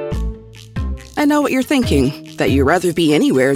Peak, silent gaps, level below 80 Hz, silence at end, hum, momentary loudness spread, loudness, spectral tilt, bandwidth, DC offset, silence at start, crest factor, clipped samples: 0 dBFS; none; -30 dBFS; 0 s; none; 13 LU; -16 LUFS; -5.5 dB/octave; 16 kHz; under 0.1%; 0 s; 16 dB; under 0.1%